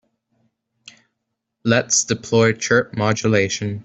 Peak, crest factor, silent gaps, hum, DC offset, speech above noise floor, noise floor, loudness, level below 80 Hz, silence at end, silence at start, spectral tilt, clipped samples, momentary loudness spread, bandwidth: -2 dBFS; 18 dB; none; none; under 0.1%; 59 dB; -78 dBFS; -18 LUFS; -56 dBFS; 0.05 s; 1.65 s; -4 dB/octave; under 0.1%; 5 LU; 8.2 kHz